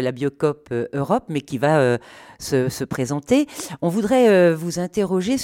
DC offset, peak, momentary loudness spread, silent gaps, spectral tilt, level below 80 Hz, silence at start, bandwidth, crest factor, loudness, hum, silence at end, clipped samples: under 0.1%; -4 dBFS; 10 LU; none; -6 dB/octave; -54 dBFS; 0 s; 17 kHz; 16 dB; -20 LUFS; none; 0 s; under 0.1%